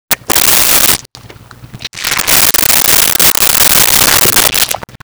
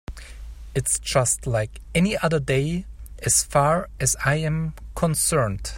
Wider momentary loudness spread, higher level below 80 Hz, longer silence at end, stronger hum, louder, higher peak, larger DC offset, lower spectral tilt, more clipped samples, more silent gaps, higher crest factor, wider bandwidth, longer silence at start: about the same, 9 LU vs 11 LU; about the same, -34 dBFS vs -38 dBFS; about the same, 0.05 s vs 0 s; neither; first, -6 LUFS vs -22 LUFS; first, 0 dBFS vs -6 dBFS; neither; second, 0 dB/octave vs -4 dB/octave; neither; neither; second, 10 dB vs 18 dB; first, over 20 kHz vs 16.5 kHz; about the same, 0.1 s vs 0.1 s